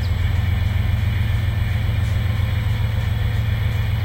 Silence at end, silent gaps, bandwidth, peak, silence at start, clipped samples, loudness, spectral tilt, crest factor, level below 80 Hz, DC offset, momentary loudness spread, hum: 0 s; none; 16 kHz; -10 dBFS; 0 s; under 0.1%; -21 LUFS; -6.5 dB/octave; 10 dB; -26 dBFS; under 0.1%; 1 LU; none